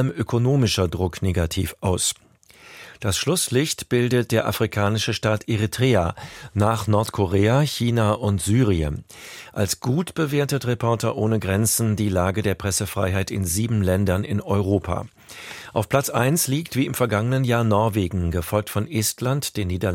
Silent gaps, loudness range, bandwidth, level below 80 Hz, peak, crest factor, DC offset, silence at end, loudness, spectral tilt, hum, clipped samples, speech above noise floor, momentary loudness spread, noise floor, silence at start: none; 2 LU; 17 kHz; -42 dBFS; -4 dBFS; 18 dB; under 0.1%; 0 s; -22 LUFS; -5 dB/octave; none; under 0.1%; 27 dB; 7 LU; -49 dBFS; 0 s